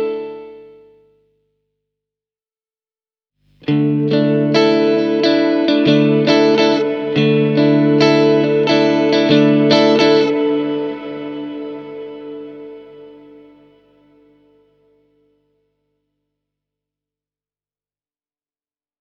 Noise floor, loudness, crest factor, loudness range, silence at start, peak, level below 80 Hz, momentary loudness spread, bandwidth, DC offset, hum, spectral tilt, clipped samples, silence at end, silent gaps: under -90 dBFS; -14 LUFS; 16 dB; 18 LU; 0 s; 0 dBFS; -62 dBFS; 19 LU; 7 kHz; under 0.1%; none; -6.5 dB/octave; under 0.1%; 5.9 s; none